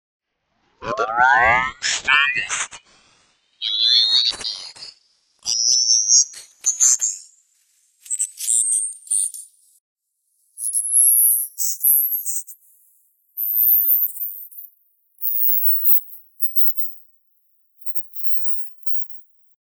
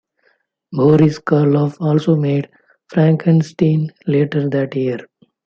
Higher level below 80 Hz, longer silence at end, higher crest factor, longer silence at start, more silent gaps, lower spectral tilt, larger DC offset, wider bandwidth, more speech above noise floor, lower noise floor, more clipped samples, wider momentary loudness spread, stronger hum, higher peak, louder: about the same, -58 dBFS vs -56 dBFS; first, 0.55 s vs 0.4 s; first, 20 dB vs 14 dB; about the same, 0.8 s vs 0.7 s; first, 9.80-9.96 s vs none; second, 2.5 dB/octave vs -9 dB/octave; neither; first, over 20 kHz vs 7 kHz; about the same, 49 dB vs 47 dB; first, -68 dBFS vs -62 dBFS; neither; first, 16 LU vs 9 LU; neither; about the same, 0 dBFS vs -2 dBFS; about the same, -16 LUFS vs -16 LUFS